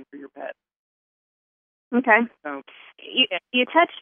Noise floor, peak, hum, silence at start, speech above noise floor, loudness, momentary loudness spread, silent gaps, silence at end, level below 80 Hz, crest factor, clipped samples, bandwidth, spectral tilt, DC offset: under -90 dBFS; -4 dBFS; none; 0 s; over 68 dB; -21 LUFS; 20 LU; 0.76-1.91 s; 0 s; -86 dBFS; 22 dB; under 0.1%; 3.7 kHz; -7 dB/octave; under 0.1%